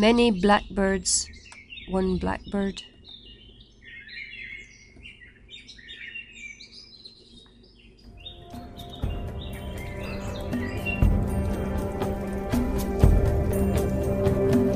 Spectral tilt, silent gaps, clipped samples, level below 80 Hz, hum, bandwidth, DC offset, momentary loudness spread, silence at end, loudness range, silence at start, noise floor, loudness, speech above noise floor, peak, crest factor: -5.5 dB/octave; none; under 0.1%; -34 dBFS; none; 15.5 kHz; under 0.1%; 23 LU; 0 s; 17 LU; 0 s; -52 dBFS; -26 LUFS; 29 dB; -4 dBFS; 22 dB